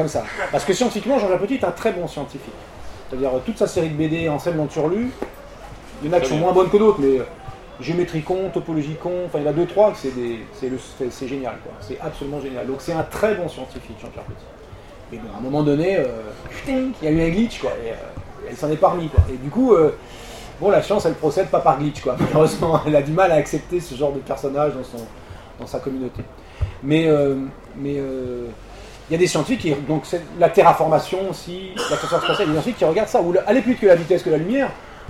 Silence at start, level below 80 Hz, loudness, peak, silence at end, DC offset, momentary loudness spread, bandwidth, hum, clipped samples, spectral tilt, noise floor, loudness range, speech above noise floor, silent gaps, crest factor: 0 s; -38 dBFS; -20 LUFS; 0 dBFS; 0 s; 0.1%; 19 LU; 15.5 kHz; none; under 0.1%; -6 dB/octave; -40 dBFS; 7 LU; 20 dB; none; 20 dB